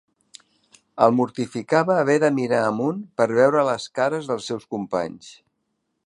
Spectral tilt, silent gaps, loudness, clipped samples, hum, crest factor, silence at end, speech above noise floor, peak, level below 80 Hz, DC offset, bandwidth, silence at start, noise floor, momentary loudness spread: -6 dB/octave; none; -21 LUFS; under 0.1%; none; 20 dB; 0.75 s; 54 dB; -2 dBFS; -68 dBFS; under 0.1%; 11.5 kHz; 0.95 s; -75 dBFS; 11 LU